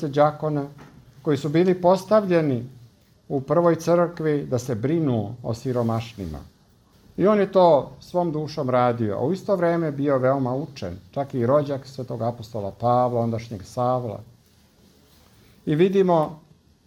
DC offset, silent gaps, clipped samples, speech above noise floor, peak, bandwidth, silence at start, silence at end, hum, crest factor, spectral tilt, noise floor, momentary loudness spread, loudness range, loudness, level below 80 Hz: under 0.1%; none; under 0.1%; 35 dB; -4 dBFS; 15.5 kHz; 0 s; 0.5 s; none; 18 dB; -7.5 dB/octave; -57 dBFS; 14 LU; 5 LU; -23 LUFS; -56 dBFS